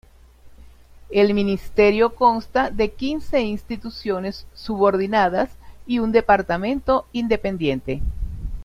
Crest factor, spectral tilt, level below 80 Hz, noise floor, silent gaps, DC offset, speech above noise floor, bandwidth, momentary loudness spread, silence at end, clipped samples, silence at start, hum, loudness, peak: 18 dB; -7 dB/octave; -36 dBFS; -46 dBFS; none; under 0.1%; 26 dB; 14.5 kHz; 12 LU; 0 s; under 0.1%; 0.45 s; none; -21 LUFS; -2 dBFS